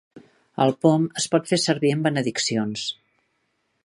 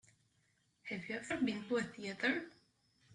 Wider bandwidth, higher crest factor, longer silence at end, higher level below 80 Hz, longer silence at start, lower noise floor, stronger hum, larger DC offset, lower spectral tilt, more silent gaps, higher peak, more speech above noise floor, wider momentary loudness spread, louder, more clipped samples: about the same, 11.5 kHz vs 11 kHz; about the same, 20 dB vs 22 dB; first, 0.9 s vs 0 s; first, -68 dBFS vs -76 dBFS; second, 0.15 s vs 0.85 s; second, -72 dBFS vs -77 dBFS; neither; neither; about the same, -4.5 dB/octave vs -4.5 dB/octave; neither; first, -4 dBFS vs -20 dBFS; first, 50 dB vs 38 dB; about the same, 10 LU vs 11 LU; first, -22 LUFS vs -39 LUFS; neither